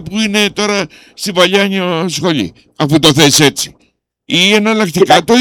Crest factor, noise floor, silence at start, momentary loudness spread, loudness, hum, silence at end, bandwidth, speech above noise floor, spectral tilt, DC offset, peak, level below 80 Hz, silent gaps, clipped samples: 12 dB; -57 dBFS; 0 s; 12 LU; -11 LUFS; none; 0 s; 19 kHz; 46 dB; -3.5 dB/octave; under 0.1%; 0 dBFS; -46 dBFS; none; 0.1%